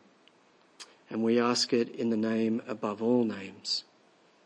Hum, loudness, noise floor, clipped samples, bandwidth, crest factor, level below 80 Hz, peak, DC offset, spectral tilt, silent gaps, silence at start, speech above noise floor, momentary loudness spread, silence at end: none; -29 LUFS; -63 dBFS; under 0.1%; 10.5 kHz; 16 dB; -84 dBFS; -14 dBFS; under 0.1%; -4.5 dB/octave; none; 0.8 s; 34 dB; 13 LU; 0.65 s